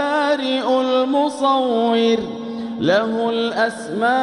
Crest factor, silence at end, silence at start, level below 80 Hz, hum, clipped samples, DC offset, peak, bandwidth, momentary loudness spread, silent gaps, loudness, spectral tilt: 14 dB; 0 s; 0 s; -62 dBFS; none; under 0.1%; under 0.1%; -4 dBFS; 11.5 kHz; 5 LU; none; -19 LUFS; -5 dB/octave